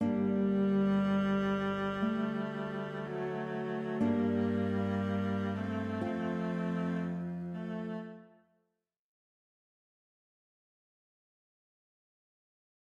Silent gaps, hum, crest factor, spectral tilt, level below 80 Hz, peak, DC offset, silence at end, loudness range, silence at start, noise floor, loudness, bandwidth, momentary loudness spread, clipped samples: none; none; 14 dB; -8.5 dB/octave; -66 dBFS; -20 dBFS; under 0.1%; 4.75 s; 12 LU; 0 s; -83 dBFS; -34 LUFS; 7 kHz; 9 LU; under 0.1%